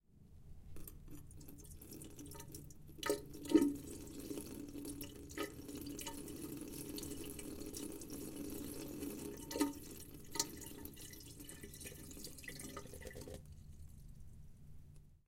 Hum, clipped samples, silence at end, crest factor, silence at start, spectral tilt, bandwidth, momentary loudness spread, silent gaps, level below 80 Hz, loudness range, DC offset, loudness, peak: none; under 0.1%; 0.1 s; 30 dB; 0.1 s; -4 dB/octave; 17 kHz; 18 LU; none; -60 dBFS; 11 LU; under 0.1%; -45 LUFS; -16 dBFS